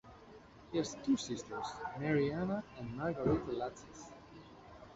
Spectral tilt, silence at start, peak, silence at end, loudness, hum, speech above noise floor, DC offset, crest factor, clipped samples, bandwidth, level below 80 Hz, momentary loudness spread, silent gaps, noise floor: -6 dB/octave; 0.05 s; -22 dBFS; 0 s; -38 LUFS; none; 20 dB; under 0.1%; 18 dB; under 0.1%; 8 kHz; -60 dBFS; 22 LU; none; -57 dBFS